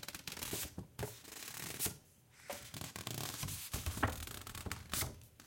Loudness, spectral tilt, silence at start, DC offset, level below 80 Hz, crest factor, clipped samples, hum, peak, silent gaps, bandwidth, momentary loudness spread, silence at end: -43 LUFS; -3 dB/octave; 0 s; under 0.1%; -56 dBFS; 26 dB; under 0.1%; none; -18 dBFS; none; 17 kHz; 8 LU; 0 s